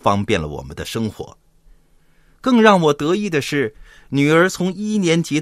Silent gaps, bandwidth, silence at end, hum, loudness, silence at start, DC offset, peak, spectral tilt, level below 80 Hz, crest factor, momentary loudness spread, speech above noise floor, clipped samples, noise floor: none; 15 kHz; 0 s; none; -17 LUFS; 0.05 s; under 0.1%; 0 dBFS; -5.5 dB/octave; -48 dBFS; 18 dB; 14 LU; 36 dB; under 0.1%; -53 dBFS